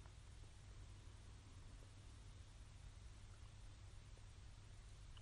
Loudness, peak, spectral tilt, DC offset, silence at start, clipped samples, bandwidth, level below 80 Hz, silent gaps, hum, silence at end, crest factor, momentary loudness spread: -62 LUFS; -46 dBFS; -4.5 dB/octave; under 0.1%; 0 s; under 0.1%; 11.5 kHz; -62 dBFS; none; none; 0 s; 12 dB; 1 LU